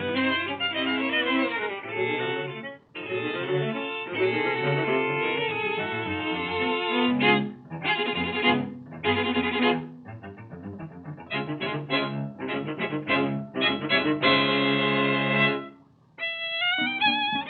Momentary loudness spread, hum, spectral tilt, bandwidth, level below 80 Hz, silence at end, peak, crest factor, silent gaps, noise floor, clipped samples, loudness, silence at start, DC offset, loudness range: 13 LU; none; -8.5 dB/octave; 4.9 kHz; -66 dBFS; 0 s; -8 dBFS; 18 dB; none; -53 dBFS; under 0.1%; -25 LUFS; 0 s; under 0.1%; 5 LU